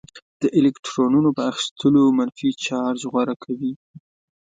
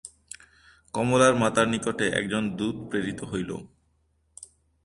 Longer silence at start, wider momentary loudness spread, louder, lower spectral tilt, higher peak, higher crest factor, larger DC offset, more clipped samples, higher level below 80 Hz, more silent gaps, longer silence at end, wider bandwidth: about the same, 0.15 s vs 0.05 s; second, 10 LU vs 24 LU; first, -21 LUFS vs -25 LUFS; about the same, -5.5 dB/octave vs -4.5 dB/octave; about the same, -6 dBFS vs -6 dBFS; second, 14 dB vs 20 dB; neither; neither; second, -64 dBFS vs -56 dBFS; first, 0.22-0.40 s, 0.79-0.83 s, 1.71-1.76 s, 3.36-3.40 s, 3.76-3.94 s vs none; about the same, 0.45 s vs 0.4 s; second, 9.2 kHz vs 11.5 kHz